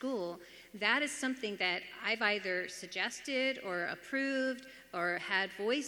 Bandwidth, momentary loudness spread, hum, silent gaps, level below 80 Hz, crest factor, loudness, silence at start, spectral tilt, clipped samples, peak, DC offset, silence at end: 19.5 kHz; 8 LU; none; none; -78 dBFS; 20 dB; -35 LUFS; 0 s; -2.5 dB/octave; under 0.1%; -16 dBFS; under 0.1%; 0 s